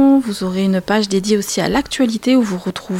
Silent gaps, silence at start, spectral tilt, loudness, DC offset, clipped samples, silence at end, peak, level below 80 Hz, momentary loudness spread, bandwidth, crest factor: none; 0 s; -5 dB/octave; -16 LUFS; under 0.1%; under 0.1%; 0 s; -4 dBFS; -44 dBFS; 5 LU; 16.5 kHz; 12 dB